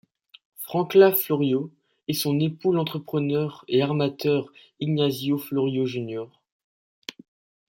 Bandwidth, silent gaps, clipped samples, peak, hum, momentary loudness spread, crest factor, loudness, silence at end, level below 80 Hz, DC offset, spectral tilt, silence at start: 17 kHz; none; under 0.1%; -4 dBFS; none; 20 LU; 20 dB; -24 LUFS; 1.45 s; -68 dBFS; under 0.1%; -6 dB/octave; 0.6 s